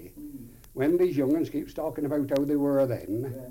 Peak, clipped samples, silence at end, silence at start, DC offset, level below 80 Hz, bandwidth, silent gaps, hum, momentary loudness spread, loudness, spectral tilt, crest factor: -14 dBFS; under 0.1%; 0 s; 0 s; under 0.1%; -54 dBFS; 17 kHz; none; none; 19 LU; -27 LUFS; -8 dB/octave; 14 dB